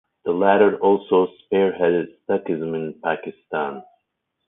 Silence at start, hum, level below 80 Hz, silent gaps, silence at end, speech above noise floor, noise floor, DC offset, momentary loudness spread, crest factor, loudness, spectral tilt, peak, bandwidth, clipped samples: 0.25 s; none; -64 dBFS; none; 0.65 s; 56 dB; -76 dBFS; under 0.1%; 12 LU; 18 dB; -21 LUFS; -11 dB/octave; -2 dBFS; 3.8 kHz; under 0.1%